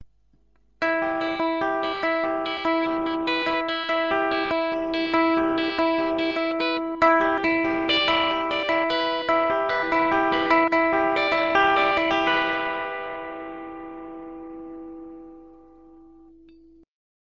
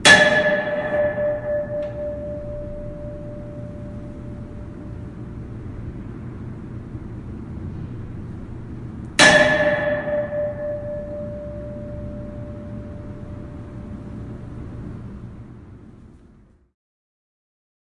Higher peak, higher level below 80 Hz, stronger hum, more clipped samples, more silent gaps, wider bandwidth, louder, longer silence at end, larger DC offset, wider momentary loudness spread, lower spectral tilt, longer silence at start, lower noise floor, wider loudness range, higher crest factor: second, -4 dBFS vs 0 dBFS; second, -56 dBFS vs -42 dBFS; neither; neither; neither; second, 7.4 kHz vs 11.5 kHz; about the same, -22 LUFS vs -21 LUFS; about the same, 1.75 s vs 1.7 s; first, 0.1% vs under 0.1%; about the same, 18 LU vs 19 LU; first, -5 dB/octave vs -3.5 dB/octave; about the same, 0 s vs 0 s; first, -64 dBFS vs -51 dBFS; second, 15 LU vs 18 LU; about the same, 20 dB vs 24 dB